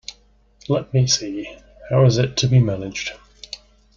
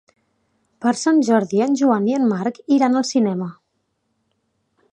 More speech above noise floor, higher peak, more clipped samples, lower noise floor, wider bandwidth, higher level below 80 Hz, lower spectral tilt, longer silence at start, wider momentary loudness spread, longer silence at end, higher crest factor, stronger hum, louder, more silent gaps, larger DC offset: second, 36 dB vs 54 dB; about the same, -4 dBFS vs -2 dBFS; neither; second, -54 dBFS vs -71 dBFS; second, 7.4 kHz vs 9.8 kHz; first, -48 dBFS vs -72 dBFS; about the same, -5 dB/octave vs -5.5 dB/octave; second, 0.1 s vs 0.8 s; first, 20 LU vs 7 LU; second, 0.4 s vs 1.4 s; about the same, 16 dB vs 18 dB; neither; about the same, -19 LUFS vs -18 LUFS; neither; neither